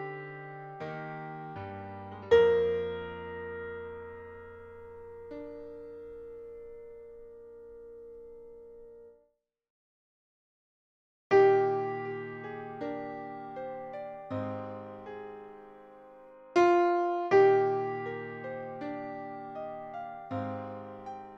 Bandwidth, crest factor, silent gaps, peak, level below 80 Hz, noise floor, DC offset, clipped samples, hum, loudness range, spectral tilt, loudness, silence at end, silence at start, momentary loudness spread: 7.2 kHz; 22 dB; 9.70-11.30 s; -10 dBFS; -66 dBFS; -74 dBFS; under 0.1%; under 0.1%; none; 20 LU; -7 dB/octave; -31 LUFS; 0 s; 0 s; 25 LU